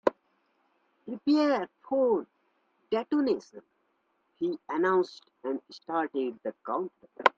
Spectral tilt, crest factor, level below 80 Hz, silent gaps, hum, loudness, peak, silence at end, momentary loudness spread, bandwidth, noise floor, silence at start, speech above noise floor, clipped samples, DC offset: -6 dB/octave; 28 dB; -76 dBFS; none; none; -30 LUFS; -4 dBFS; 0.05 s; 11 LU; 7.6 kHz; -74 dBFS; 0.05 s; 45 dB; under 0.1%; under 0.1%